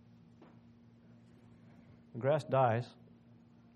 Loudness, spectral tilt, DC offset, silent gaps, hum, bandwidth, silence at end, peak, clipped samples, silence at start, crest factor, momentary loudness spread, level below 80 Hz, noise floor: -33 LUFS; -8 dB/octave; under 0.1%; none; none; 9 kHz; 0.85 s; -16 dBFS; under 0.1%; 2.15 s; 22 dB; 19 LU; -76 dBFS; -61 dBFS